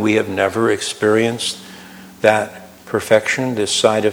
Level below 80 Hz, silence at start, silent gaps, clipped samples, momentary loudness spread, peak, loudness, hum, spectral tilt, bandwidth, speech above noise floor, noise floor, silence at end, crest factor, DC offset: -58 dBFS; 0 s; none; under 0.1%; 15 LU; 0 dBFS; -17 LUFS; none; -4 dB/octave; over 20 kHz; 22 dB; -38 dBFS; 0 s; 18 dB; under 0.1%